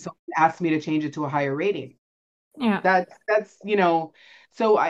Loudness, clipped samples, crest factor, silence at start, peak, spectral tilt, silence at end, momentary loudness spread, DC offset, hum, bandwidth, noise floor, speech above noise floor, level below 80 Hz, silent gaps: -24 LUFS; under 0.1%; 18 dB; 0 s; -6 dBFS; -6.5 dB/octave; 0 s; 7 LU; under 0.1%; none; 7.8 kHz; under -90 dBFS; over 67 dB; -72 dBFS; 0.19-0.27 s, 1.98-2.51 s